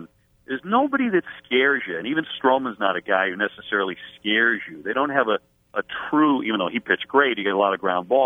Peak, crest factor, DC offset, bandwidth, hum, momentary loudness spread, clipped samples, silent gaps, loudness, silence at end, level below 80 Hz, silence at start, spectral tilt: -2 dBFS; 20 dB; under 0.1%; 3.9 kHz; none; 9 LU; under 0.1%; none; -22 LUFS; 0 s; -66 dBFS; 0 s; -7 dB/octave